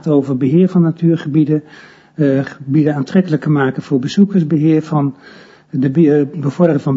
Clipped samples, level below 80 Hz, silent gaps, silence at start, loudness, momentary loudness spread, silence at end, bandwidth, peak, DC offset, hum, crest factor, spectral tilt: under 0.1%; -60 dBFS; none; 0.05 s; -14 LUFS; 7 LU; 0 s; 7.6 kHz; 0 dBFS; under 0.1%; none; 14 dB; -9 dB/octave